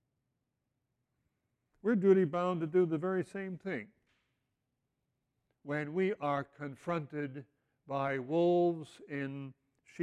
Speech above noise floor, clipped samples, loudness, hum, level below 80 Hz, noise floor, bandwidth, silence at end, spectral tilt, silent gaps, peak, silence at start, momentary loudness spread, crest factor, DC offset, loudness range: 52 dB; under 0.1%; -34 LUFS; none; -80 dBFS; -85 dBFS; 9.8 kHz; 0 s; -8.5 dB/octave; none; -14 dBFS; 1.85 s; 15 LU; 20 dB; under 0.1%; 6 LU